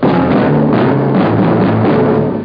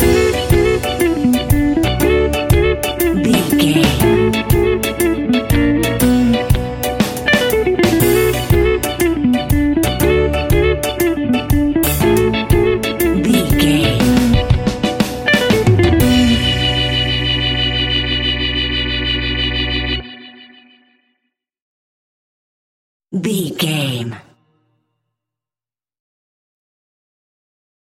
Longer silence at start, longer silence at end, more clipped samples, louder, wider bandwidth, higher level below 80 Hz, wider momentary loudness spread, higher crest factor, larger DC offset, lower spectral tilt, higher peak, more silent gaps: about the same, 0 s vs 0 s; second, 0 s vs 3.8 s; neither; first, -11 LUFS vs -14 LUFS; second, 5.2 kHz vs 17 kHz; second, -40 dBFS vs -26 dBFS; second, 1 LU vs 5 LU; second, 10 dB vs 16 dB; neither; first, -10.5 dB/octave vs -5 dB/octave; about the same, 0 dBFS vs 0 dBFS; second, none vs 21.62-23.00 s